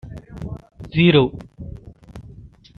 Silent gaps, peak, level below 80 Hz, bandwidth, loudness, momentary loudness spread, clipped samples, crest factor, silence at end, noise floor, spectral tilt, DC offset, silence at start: none; -2 dBFS; -44 dBFS; 5.4 kHz; -17 LUFS; 26 LU; under 0.1%; 20 dB; 0.35 s; -43 dBFS; -8.5 dB/octave; under 0.1%; 0.05 s